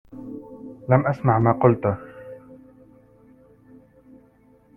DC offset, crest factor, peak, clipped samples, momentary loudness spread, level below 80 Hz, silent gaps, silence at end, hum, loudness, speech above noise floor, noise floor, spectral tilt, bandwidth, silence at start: under 0.1%; 22 dB; -2 dBFS; under 0.1%; 23 LU; -56 dBFS; none; 2.2 s; 50 Hz at -50 dBFS; -20 LUFS; 37 dB; -56 dBFS; -11.5 dB/octave; 3.2 kHz; 0.15 s